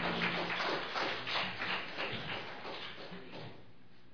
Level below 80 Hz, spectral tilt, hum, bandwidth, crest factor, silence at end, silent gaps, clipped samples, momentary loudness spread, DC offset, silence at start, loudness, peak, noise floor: -70 dBFS; -4.5 dB/octave; none; 5.4 kHz; 18 dB; 0 s; none; under 0.1%; 14 LU; 0.3%; 0 s; -37 LUFS; -20 dBFS; -62 dBFS